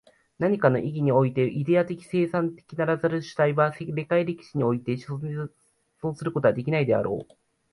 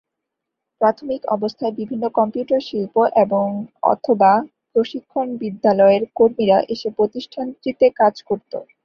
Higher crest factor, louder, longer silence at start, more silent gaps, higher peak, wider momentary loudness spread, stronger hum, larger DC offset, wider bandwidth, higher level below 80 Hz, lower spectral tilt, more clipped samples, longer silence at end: about the same, 18 dB vs 16 dB; second, -25 LUFS vs -19 LUFS; second, 0.4 s vs 0.8 s; neither; second, -6 dBFS vs -2 dBFS; about the same, 10 LU vs 11 LU; neither; neither; first, 11.5 kHz vs 6.8 kHz; about the same, -62 dBFS vs -62 dBFS; about the same, -8.5 dB/octave vs -7.5 dB/octave; neither; first, 0.5 s vs 0.2 s